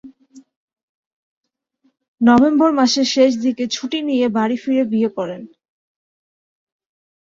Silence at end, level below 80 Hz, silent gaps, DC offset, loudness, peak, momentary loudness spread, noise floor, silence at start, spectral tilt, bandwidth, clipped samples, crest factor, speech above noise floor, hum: 1.85 s; -60 dBFS; 0.56-0.68 s, 0.83-1.43 s, 2.08-2.15 s; under 0.1%; -17 LUFS; -2 dBFS; 10 LU; -64 dBFS; 0.05 s; -4.5 dB/octave; 7.6 kHz; under 0.1%; 18 dB; 48 dB; none